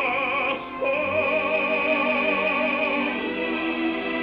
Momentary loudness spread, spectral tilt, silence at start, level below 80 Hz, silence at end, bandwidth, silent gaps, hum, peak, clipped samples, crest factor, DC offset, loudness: 4 LU; -7 dB/octave; 0 s; -58 dBFS; 0 s; 5.6 kHz; none; none; -10 dBFS; under 0.1%; 14 dB; under 0.1%; -23 LUFS